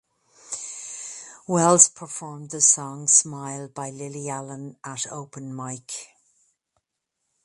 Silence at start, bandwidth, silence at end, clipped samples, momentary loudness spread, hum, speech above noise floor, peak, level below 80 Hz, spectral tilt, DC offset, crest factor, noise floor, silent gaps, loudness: 0.45 s; 14 kHz; 1.4 s; under 0.1%; 20 LU; none; 56 dB; 0 dBFS; -72 dBFS; -3 dB/octave; under 0.1%; 26 dB; -80 dBFS; none; -20 LUFS